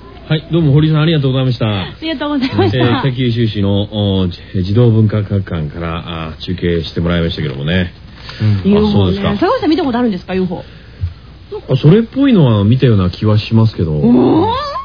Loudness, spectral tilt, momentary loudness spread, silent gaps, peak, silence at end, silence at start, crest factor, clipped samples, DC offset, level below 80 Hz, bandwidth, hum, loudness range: -13 LUFS; -9 dB/octave; 11 LU; none; 0 dBFS; 0 s; 0 s; 12 dB; under 0.1%; 0.4%; -34 dBFS; 5.4 kHz; none; 4 LU